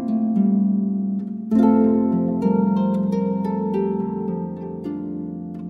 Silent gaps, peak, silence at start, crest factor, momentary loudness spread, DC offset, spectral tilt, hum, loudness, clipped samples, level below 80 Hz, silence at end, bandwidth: none; -6 dBFS; 0 s; 14 dB; 12 LU; under 0.1%; -11 dB/octave; none; -21 LUFS; under 0.1%; -56 dBFS; 0 s; 4.2 kHz